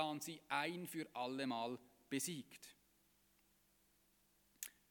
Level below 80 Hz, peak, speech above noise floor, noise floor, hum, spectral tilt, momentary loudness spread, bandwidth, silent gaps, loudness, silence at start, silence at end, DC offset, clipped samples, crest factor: -86 dBFS; -24 dBFS; 31 dB; -77 dBFS; 50 Hz at -85 dBFS; -3.5 dB/octave; 13 LU; 19 kHz; none; -45 LUFS; 0 s; 0.2 s; under 0.1%; under 0.1%; 24 dB